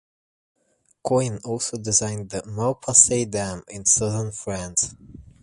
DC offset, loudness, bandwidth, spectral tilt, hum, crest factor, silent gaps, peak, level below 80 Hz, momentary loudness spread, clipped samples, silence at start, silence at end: under 0.1%; -21 LUFS; 11.5 kHz; -3.5 dB/octave; none; 24 dB; none; 0 dBFS; -50 dBFS; 15 LU; under 0.1%; 1.05 s; 0.2 s